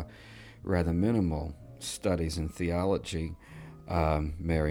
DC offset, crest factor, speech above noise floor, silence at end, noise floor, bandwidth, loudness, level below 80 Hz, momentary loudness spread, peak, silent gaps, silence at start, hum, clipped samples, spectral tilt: under 0.1%; 18 dB; 20 dB; 0 s; -50 dBFS; 16.5 kHz; -31 LUFS; -42 dBFS; 18 LU; -12 dBFS; none; 0 s; none; under 0.1%; -6.5 dB/octave